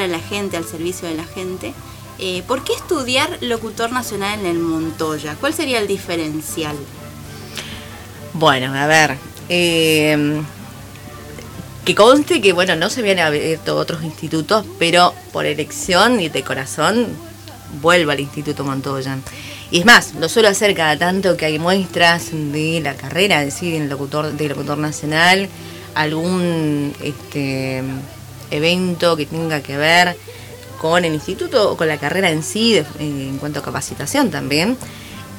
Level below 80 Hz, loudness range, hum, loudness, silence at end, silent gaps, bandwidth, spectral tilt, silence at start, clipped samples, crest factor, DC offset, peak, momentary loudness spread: -48 dBFS; 6 LU; none; -17 LUFS; 0 s; none; 20 kHz; -4 dB/octave; 0 s; under 0.1%; 18 dB; under 0.1%; 0 dBFS; 18 LU